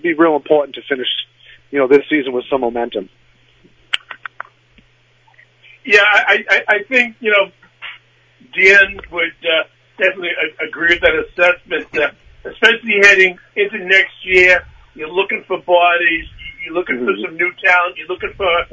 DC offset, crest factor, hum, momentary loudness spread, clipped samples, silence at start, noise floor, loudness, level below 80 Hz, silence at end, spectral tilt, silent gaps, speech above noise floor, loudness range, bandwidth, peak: under 0.1%; 16 dB; none; 19 LU; 0.1%; 0.05 s; -53 dBFS; -14 LUFS; -48 dBFS; 0.1 s; -3.5 dB/octave; none; 38 dB; 7 LU; 8 kHz; 0 dBFS